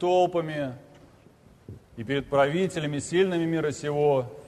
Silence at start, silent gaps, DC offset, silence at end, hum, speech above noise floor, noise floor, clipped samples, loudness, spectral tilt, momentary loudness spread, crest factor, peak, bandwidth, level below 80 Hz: 0 s; none; under 0.1%; 0 s; none; 30 dB; -55 dBFS; under 0.1%; -26 LUFS; -6 dB/octave; 12 LU; 16 dB; -10 dBFS; 13 kHz; -58 dBFS